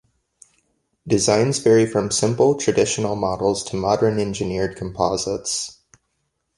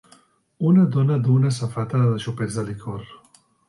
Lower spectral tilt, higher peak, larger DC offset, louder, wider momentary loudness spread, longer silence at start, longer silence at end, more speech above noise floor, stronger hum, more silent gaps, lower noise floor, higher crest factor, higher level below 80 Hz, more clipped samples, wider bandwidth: second, -4.5 dB/octave vs -8 dB/octave; first, -4 dBFS vs -8 dBFS; neither; about the same, -20 LUFS vs -21 LUFS; second, 8 LU vs 14 LU; first, 1.05 s vs 0.6 s; first, 0.85 s vs 0.55 s; first, 53 dB vs 36 dB; neither; neither; first, -73 dBFS vs -56 dBFS; about the same, 18 dB vs 14 dB; first, -48 dBFS vs -58 dBFS; neither; about the same, 11.5 kHz vs 11.5 kHz